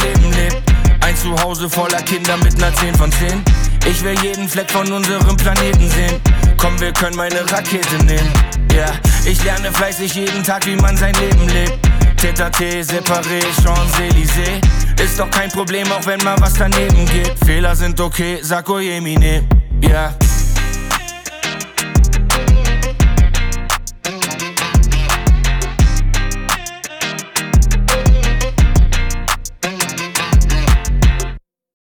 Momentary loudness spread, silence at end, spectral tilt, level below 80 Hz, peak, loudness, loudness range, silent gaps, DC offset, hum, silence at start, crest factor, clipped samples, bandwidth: 6 LU; 0.55 s; -4.5 dB/octave; -14 dBFS; -2 dBFS; -15 LUFS; 2 LU; none; under 0.1%; none; 0 s; 10 dB; under 0.1%; over 20 kHz